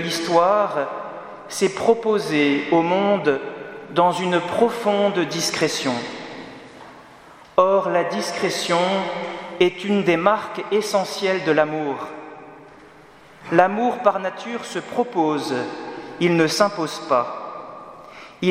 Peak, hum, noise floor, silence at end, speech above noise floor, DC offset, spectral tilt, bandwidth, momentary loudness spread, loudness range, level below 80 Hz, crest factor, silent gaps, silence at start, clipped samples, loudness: 0 dBFS; none; -47 dBFS; 0 s; 27 dB; under 0.1%; -4.5 dB/octave; 16 kHz; 16 LU; 3 LU; -66 dBFS; 22 dB; none; 0 s; under 0.1%; -21 LUFS